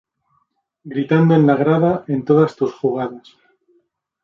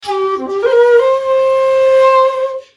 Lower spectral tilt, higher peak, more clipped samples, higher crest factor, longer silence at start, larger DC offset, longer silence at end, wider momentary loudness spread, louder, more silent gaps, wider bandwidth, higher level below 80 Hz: first, -9.5 dB/octave vs -3.5 dB/octave; about the same, -2 dBFS vs -2 dBFS; neither; first, 16 dB vs 10 dB; first, 0.85 s vs 0.05 s; neither; first, 1.05 s vs 0.15 s; first, 12 LU vs 8 LU; second, -17 LUFS vs -11 LUFS; neither; second, 7 kHz vs 10.5 kHz; about the same, -60 dBFS vs -60 dBFS